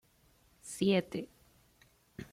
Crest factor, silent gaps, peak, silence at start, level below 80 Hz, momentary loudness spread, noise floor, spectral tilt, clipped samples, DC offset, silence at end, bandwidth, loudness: 20 dB; none; -18 dBFS; 0.65 s; -68 dBFS; 22 LU; -68 dBFS; -5.5 dB/octave; under 0.1%; under 0.1%; 0.1 s; 15.5 kHz; -34 LUFS